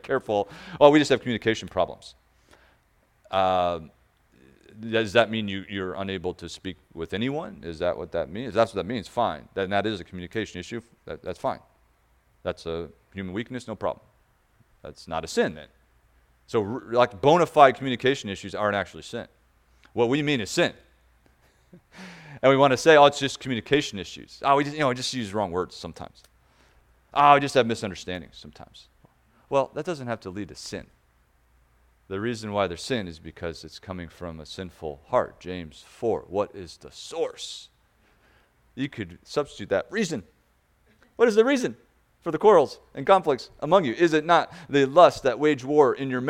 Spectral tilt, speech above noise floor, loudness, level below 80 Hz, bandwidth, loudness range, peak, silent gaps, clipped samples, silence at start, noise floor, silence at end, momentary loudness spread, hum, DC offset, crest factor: -5 dB/octave; 40 dB; -24 LUFS; -58 dBFS; 14.5 kHz; 11 LU; 0 dBFS; none; under 0.1%; 0.05 s; -65 dBFS; 0 s; 20 LU; none; under 0.1%; 24 dB